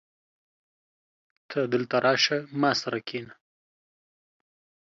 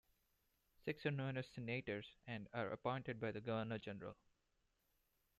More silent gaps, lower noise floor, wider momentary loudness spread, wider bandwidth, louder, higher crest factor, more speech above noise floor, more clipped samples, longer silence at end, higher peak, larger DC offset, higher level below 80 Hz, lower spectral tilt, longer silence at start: neither; first, under -90 dBFS vs -84 dBFS; first, 12 LU vs 8 LU; second, 7.6 kHz vs 13.5 kHz; first, -26 LUFS vs -46 LUFS; about the same, 22 dB vs 22 dB; first, over 64 dB vs 38 dB; neither; first, 1.55 s vs 1.25 s; first, -8 dBFS vs -26 dBFS; neither; about the same, -76 dBFS vs -76 dBFS; second, -4 dB/octave vs -7.5 dB/octave; first, 1.5 s vs 0.85 s